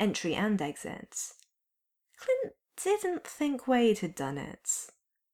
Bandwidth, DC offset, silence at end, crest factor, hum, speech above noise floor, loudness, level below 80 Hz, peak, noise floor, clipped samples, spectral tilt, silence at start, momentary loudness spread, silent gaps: 17.5 kHz; under 0.1%; 0.45 s; 18 dB; none; 53 dB; -32 LUFS; -68 dBFS; -16 dBFS; -85 dBFS; under 0.1%; -4 dB/octave; 0 s; 13 LU; none